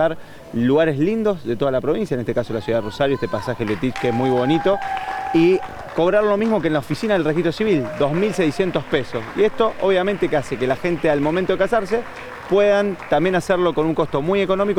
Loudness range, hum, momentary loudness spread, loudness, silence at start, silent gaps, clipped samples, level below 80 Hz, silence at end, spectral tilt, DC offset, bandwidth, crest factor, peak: 2 LU; none; 6 LU; -20 LUFS; 0 s; none; under 0.1%; -46 dBFS; 0 s; -6.5 dB/octave; under 0.1%; 19 kHz; 16 dB; -4 dBFS